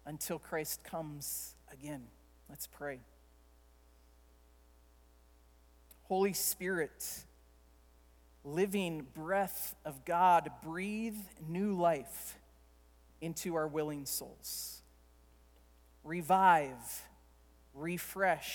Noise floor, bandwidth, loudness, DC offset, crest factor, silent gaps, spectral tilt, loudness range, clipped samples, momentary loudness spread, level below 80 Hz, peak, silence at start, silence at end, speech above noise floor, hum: -64 dBFS; 19.5 kHz; -36 LUFS; under 0.1%; 24 dB; none; -4 dB/octave; 13 LU; under 0.1%; 18 LU; -64 dBFS; -14 dBFS; 0.05 s; 0 s; 28 dB; 60 Hz at -65 dBFS